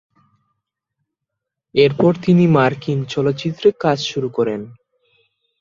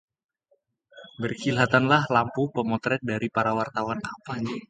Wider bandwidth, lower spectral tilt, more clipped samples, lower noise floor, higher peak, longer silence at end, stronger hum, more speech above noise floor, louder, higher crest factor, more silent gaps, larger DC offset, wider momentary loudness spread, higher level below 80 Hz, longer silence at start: second, 7.4 kHz vs 9.2 kHz; about the same, -7 dB/octave vs -6 dB/octave; neither; first, -81 dBFS vs -70 dBFS; about the same, -2 dBFS vs -4 dBFS; first, 0.85 s vs 0.05 s; neither; first, 65 dB vs 45 dB; first, -17 LUFS vs -25 LUFS; about the same, 18 dB vs 22 dB; neither; neither; second, 9 LU vs 12 LU; about the same, -56 dBFS vs -60 dBFS; first, 1.75 s vs 0.95 s